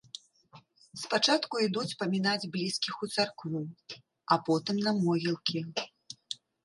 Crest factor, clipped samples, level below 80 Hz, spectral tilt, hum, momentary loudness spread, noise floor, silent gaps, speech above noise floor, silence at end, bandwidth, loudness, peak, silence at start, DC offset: 20 dB; under 0.1%; -78 dBFS; -4.5 dB/octave; none; 19 LU; -59 dBFS; none; 28 dB; 0.3 s; 11.5 kHz; -30 LUFS; -12 dBFS; 0.15 s; under 0.1%